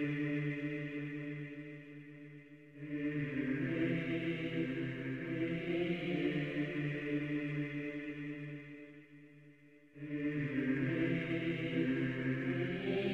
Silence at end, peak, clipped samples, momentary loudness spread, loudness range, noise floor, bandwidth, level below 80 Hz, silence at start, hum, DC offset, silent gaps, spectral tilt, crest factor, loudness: 0 s; -22 dBFS; under 0.1%; 16 LU; 5 LU; -61 dBFS; 7.6 kHz; -68 dBFS; 0 s; none; under 0.1%; none; -8.5 dB/octave; 16 dB; -38 LUFS